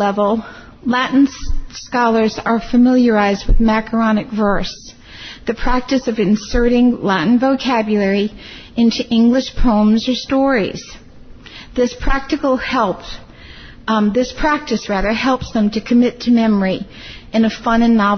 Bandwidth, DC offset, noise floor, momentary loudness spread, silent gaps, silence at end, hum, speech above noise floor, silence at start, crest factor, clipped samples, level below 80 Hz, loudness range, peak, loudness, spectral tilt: 6.6 kHz; under 0.1%; -37 dBFS; 14 LU; none; 0 s; none; 22 dB; 0 s; 12 dB; under 0.1%; -28 dBFS; 4 LU; -4 dBFS; -16 LUFS; -6 dB/octave